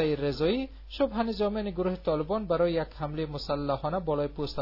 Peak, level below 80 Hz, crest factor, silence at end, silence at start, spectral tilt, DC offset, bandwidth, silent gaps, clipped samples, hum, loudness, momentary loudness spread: -14 dBFS; -46 dBFS; 16 dB; 0 s; 0 s; -8 dB/octave; under 0.1%; 5.8 kHz; none; under 0.1%; none; -30 LUFS; 6 LU